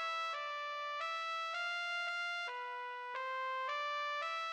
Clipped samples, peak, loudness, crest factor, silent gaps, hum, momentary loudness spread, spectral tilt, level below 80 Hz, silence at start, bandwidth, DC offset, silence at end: under 0.1%; -28 dBFS; -39 LUFS; 12 dB; none; none; 5 LU; 3.5 dB/octave; under -90 dBFS; 0 s; 18.5 kHz; under 0.1%; 0 s